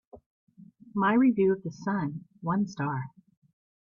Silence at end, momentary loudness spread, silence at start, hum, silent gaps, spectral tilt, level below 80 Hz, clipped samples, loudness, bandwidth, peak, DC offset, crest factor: 0.8 s; 14 LU; 0.15 s; none; 0.26-0.47 s; -8 dB/octave; -68 dBFS; under 0.1%; -28 LUFS; 7.2 kHz; -12 dBFS; under 0.1%; 18 dB